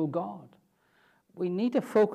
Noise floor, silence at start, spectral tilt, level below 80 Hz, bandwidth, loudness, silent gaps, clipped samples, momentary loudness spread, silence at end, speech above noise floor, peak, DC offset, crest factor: -67 dBFS; 0 s; -8 dB/octave; -82 dBFS; 13.5 kHz; -30 LUFS; none; under 0.1%; 14 LU; 0 s; 39 dB; -12 dBFS; under 0.1%; 18 dB